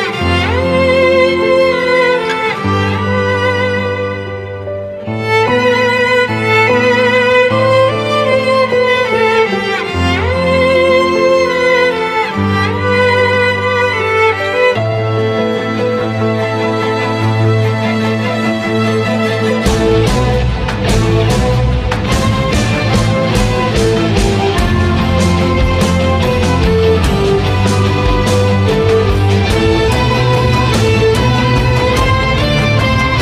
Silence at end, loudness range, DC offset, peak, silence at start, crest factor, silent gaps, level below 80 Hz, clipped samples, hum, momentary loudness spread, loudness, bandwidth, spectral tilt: 0 s; 3 LU; under 0.1%; 0 dBFS; 0 s; 12 dB; none; -24 dBFS; under 0.1%; none; 5 LU; -12 LUFS; 15 kHz; -6 dB/octave